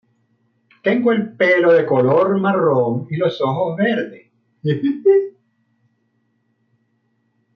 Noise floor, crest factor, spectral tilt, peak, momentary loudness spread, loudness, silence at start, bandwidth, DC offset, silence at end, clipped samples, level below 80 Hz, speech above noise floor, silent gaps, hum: -66 dBFS; 14 dB; -8.5 dB/octave; -4 dBFS; 9 LU; -17 LUFS; 0.85 s; 6.2 kHz; under 0.1%; 2.25 s; under 0.1%; -66 dBFS; 50 dB; none; none